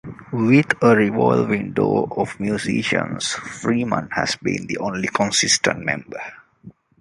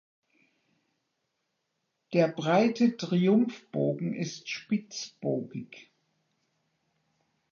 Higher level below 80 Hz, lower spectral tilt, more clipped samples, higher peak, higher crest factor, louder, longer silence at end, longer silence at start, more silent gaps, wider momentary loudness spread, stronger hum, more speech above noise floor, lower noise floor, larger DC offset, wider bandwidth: first, -54 dBFS vs -80 dBFS; second, -4 dB/octave vs -6.5 dB/octave; neither; first, -2 dBFS vs -10 dBFS; about the same, 18 dB vs 20 dB; first, -20 LUFS vs -28 LUFS; second, 0.3 s vs 1.7 s; second, 0.05 s vs 2.1 s; neither; second, 9 LU vs 13 LU; neither; second, 26 dB vs 52 dB; second, -46 dBFS vs -80 dBFS; neither; first, 11.5 kHz vs 7.2 kHz